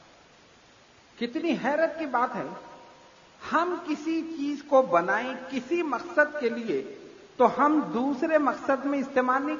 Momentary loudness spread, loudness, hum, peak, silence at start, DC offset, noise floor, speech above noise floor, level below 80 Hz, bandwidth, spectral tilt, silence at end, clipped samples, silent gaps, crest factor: 11 LU; -27 LUFS; none; -8 dBFS; 1.2 s; under 0.1%; -56 dBFS; 30 dB; -70 dBFS; 7.4 kHz; -5.5 dB/octave; 0 s; under 0.1%; none; 20 dB